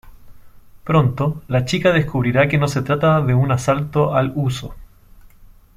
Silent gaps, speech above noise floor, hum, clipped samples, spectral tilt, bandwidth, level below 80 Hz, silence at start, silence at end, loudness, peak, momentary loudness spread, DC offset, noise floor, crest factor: none; 28 dB; none; under 0.1%; -7 dB/octave; 14 kHz; -42 dBFS; 0.05 s; 0.3 s; -18 LUFS; -2 dBFS; 7 LU; under 0.1%; -45 dBFS; 16 dB